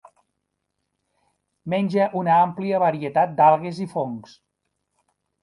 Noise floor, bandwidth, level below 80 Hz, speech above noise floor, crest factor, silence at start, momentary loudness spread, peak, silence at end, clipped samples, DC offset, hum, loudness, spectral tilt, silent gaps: -78 dBFS; 11.5 kHz; -70 dBFS; 57 dB; 20 dB; 1.65 s; 12 LU; -4 dBFS; 1.2 s; under 0.1%; under 0.1%; none; -21 LUFS; -8 dB/octave; none